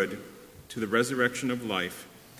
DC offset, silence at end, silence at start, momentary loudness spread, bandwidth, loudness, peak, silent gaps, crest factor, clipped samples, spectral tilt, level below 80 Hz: under 0.1%; 0 s; 0 s; 18 LU; 16 kHz; -29 LUFS; -10 dBFS; none; 20 dB; under 0.1%; -4 dB/octave; -64 dBFS